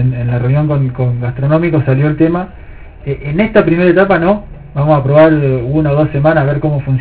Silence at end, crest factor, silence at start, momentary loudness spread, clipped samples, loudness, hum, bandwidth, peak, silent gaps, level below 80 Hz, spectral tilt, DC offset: 0 s; 12 dB; 0 s; 9 LU; 0.3%; -12 LUFS; none; 4 kHz; 0 dBFS; none; -32 dBFS; -12 dB/octave; under 0.1%